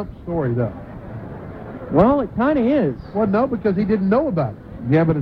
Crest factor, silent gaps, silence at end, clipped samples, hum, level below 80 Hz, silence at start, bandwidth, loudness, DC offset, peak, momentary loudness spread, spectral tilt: 18 dB; none; 0 s; under 0.1%; none; -42 dBFS; 0 s; 5.4 kHz; -19 LUFS; under 0.1%; -2 dBFS; 17 LU; -10.5 dB/octave